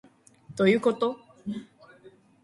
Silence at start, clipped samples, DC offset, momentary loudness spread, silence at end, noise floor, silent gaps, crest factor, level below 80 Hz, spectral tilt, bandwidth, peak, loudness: 0.5 s; under 0.1%; under 0.1%; 17 LU; 0.8 s; -55 dBFS; none; 20 dB; -70 dBFS; -6.5 dB/octave; 11.5 kHz; -8 dBFS; -26 LUFS